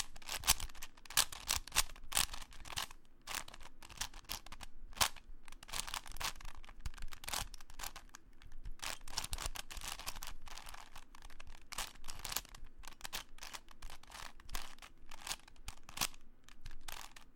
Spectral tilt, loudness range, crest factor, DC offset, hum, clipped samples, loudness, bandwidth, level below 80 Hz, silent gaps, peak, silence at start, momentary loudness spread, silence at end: 0 dB/octave; 9 LU; 32 dB; under 0.1%; none; under 0.1%; -41 LUFS; 17 kHz; -50 dBFS; none; -10 dBFS; 0 s; 21 LU; 0 s